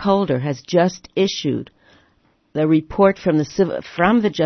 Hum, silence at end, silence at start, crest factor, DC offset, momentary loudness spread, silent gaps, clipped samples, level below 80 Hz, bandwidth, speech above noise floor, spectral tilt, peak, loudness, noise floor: none; 0 s; 0 s; 18 dB; under 0.1%; 7 LU; none; under 0.1%; -50 dBFS; 6.4 kHz; 42 dB; -6.5 dB/octave; 0 dBFS; -19 LUFS; -60 dBFS